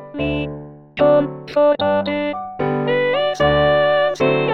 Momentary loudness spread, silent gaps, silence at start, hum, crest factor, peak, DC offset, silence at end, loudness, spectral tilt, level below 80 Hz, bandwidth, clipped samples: 10 LU; none; 0 s; none; 14 dB; -4 dBFS; under 0.1%; 0 s; -17 LUFS; -6.5 dB/octave; -42 dBFS; 7 kHz; under 0.1%